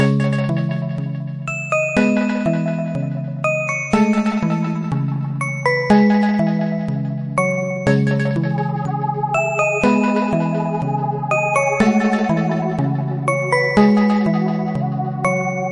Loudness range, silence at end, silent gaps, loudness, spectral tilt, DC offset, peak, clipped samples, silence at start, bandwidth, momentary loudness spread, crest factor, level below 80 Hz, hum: 3 LU; 0 s; none; -18 LUFS; -7 dB/octave; under 0.1%; -2 dBFS; under 0.1%; 0 s; 10.5 kHz; 7 LU; 16 dB; -50 dBFS; none